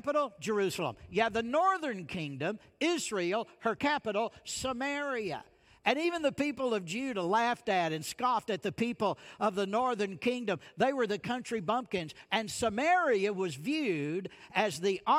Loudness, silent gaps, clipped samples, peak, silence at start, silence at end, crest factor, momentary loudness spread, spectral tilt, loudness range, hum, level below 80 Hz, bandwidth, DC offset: -32 LUFS; none; under 0.1%; -14 dBFS; 0.05 s; 0 s; 18 dB; 7 LU; -4 dB/octave; 2 LU; none; -68 dBFS; 16 kHz; under 0.1%